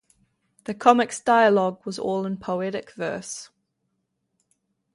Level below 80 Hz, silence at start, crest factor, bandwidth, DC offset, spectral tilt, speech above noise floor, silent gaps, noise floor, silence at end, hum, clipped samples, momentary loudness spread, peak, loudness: -68 dBFS; 0.7 s; 24 dB; 11.5 kHz; under 0.1%; -4.5 dB/octave; 54 dB; none; -76 dBFS; 1.5 s; none; under 0.1%; 17 LU; -2 dBFS; -23 LUFS